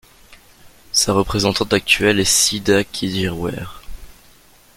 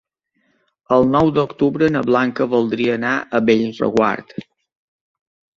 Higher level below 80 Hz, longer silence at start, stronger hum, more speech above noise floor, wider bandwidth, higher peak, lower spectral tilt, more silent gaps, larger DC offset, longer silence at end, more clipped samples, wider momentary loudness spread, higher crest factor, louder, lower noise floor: first, -40 dBFS vs -52 dBFS; second, 0.3 s vs 0.9 s; neither; second, 31 dB vs 50 dB; first, 17 kHz vs 7.6 kHz; about the same, -2 dBFS vs -2 dBFS; second, -3 dB/octave vs -7 dB/octave; neither; neither; second, 0.65 s vs 1.15 s; neither; first, 12 LU vs 5 LU; about the same, 18 dB vs 16 dB; about the same, -17 LUFS vs -17 LUFS; second, -49 dBFS vs -66 dBFS